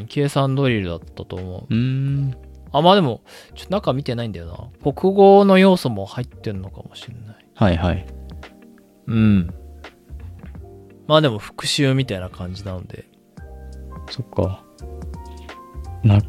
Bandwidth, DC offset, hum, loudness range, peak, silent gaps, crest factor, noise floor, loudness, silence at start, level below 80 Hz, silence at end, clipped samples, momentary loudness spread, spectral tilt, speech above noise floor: 13 kHz; under 0.1%; none; 9 LU; -2 dBFS; none; 18 dB; -48 dBFS; -19 LUFS; 0 s; -42 dBFS; 0 s; under 0.1%; 24 LU; -6.5 dB/octave; 29 dB